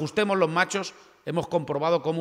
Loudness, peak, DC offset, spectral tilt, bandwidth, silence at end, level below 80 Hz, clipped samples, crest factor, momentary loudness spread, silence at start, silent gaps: -26 LUFS; -8 dBFS; under 0.1%; -5 dB/octave; 14 kHz; 0 s; -64 dBFS; under 0.1%; 18 dB; 10 LU; 0 s; none